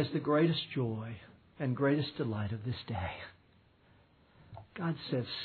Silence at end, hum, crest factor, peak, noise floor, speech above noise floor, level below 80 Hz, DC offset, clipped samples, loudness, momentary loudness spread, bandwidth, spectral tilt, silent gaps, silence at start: 0 s; none; 18 dB; -18 dBFS; -65 dBFS; 32 dB; -64 dBFS; under 0.1%; under 0.1%; -34 LUFS; 21 LU; 4.6 kHz; -5.5 dB/octave; none; 0 s